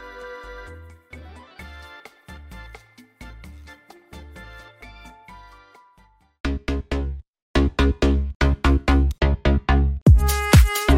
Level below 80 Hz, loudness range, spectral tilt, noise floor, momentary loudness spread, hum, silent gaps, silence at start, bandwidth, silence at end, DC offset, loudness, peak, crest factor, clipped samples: -24 dBFS; 24 LU; -6 dB/octave; -57 dBFS; 27 LU; none; 6.40-6.44 s, 7.28-7.33 s, 7.42-7.54 s, 8.35-8.40 s, 10.02-10.06 s; 0 s; 16 kHz; 0 s; under 0.1%; -20 LUFS; -2 dBFS; 20 dB; under 0.1%